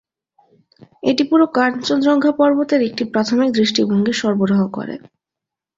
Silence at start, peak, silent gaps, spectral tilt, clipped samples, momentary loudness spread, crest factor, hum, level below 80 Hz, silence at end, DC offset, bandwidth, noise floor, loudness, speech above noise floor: 1.05 s; -2 dBFS; none; -5.5 dB/octave; under 0.1%; 8 LU; 16 dB; none; -60 dBFS; 0.8 s; under 0.1%; 7.8 kHz; -85 dBFS; -16 LUFS; 69 dB